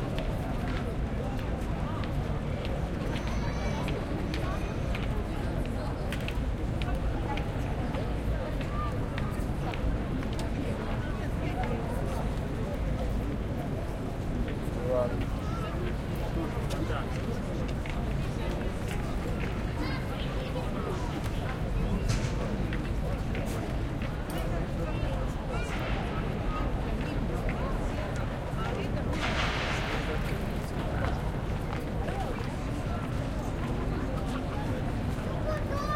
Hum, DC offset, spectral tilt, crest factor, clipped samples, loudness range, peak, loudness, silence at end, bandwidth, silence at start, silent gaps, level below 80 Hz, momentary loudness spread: none; under 0.1%; -6.5 dB/octave; 14 dB; under 0.1%; 2 LU; -16 dBFS; -33 LUFS; 0 s; 16 kHz; 0 s; none; -36 dBFS; 2 LU